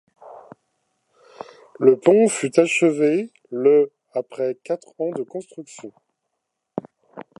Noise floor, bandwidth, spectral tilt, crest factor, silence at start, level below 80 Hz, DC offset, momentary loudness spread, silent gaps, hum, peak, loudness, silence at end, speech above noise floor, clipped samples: -79 dBFS; 11.5 kHz; -5 dB/octave; 20 dB; 0.25 s; -78 dBFS; under 0.1%; 23 LU; none; none; -2 dBFS; -20 LUFS; 0.2 s; 59 dB; under 0.1%